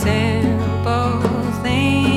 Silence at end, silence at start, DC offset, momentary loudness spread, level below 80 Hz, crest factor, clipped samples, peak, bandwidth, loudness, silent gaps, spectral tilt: 0 s; 0 s; under 0.1%; 3 LU; -36 dBFS; 14 dB; under 0.1%; -4 dBFS; 15 kHz; -18 LUFS; none; -6.5 dB/octave